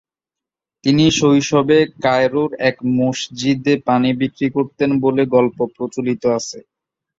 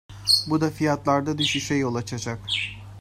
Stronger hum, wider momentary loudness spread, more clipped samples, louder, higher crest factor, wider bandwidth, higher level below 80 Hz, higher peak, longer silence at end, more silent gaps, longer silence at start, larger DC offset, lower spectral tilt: neither; about the same, 9 LU vs 10 LU; neither; first, -17 LUFS vs -23 LUFS; about the same, 16 dB vs 18 dB; second, 7.8 kHz vs 15.5 kHz; about the same, -52 dBFS vs -52 dBFS; first, -2 dBFS vs -8 dBFS; first, 0.6 s vs 0 s; neither; first, 0.85 s vs 0.1 s; neither; first, -5.5 dB/octave vs -4 dB/octave